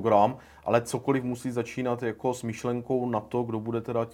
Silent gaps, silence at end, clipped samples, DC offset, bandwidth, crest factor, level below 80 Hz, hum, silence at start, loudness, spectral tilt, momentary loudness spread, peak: none; 0 s; under 0.1%; under 0.1%; 17.5 kHz; 20 dB; -62 dBFS; none; 0 s; -29 LUFS; -6.5 dB/octave; 6 LU; -8 dBFS